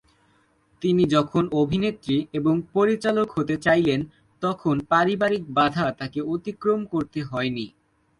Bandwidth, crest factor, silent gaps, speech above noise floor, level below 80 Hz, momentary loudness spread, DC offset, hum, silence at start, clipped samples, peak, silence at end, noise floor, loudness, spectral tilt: 11.5 kHz; 18 dB; none; 40 dB; -56 dBFS; 9 LU; under 0.1%; none; 0.8 s; under 0.1%; -6 dBFS; 0.5 s; -63 dBFS; -23 LUFS; -7 dB/octave